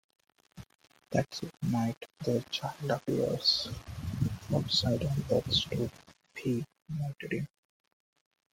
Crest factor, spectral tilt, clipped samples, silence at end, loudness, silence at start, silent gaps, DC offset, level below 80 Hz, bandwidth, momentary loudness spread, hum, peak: 20 dB; -5.5 dB/octave; under 0.1%; 1.05 s; -32 LUFS; 0.55 s; 0.75-0.79 s, 1.97-2.01 s; under 0.1%; -56 dBFS; 16.5 kHz; 11 LU; none; -14 dBFS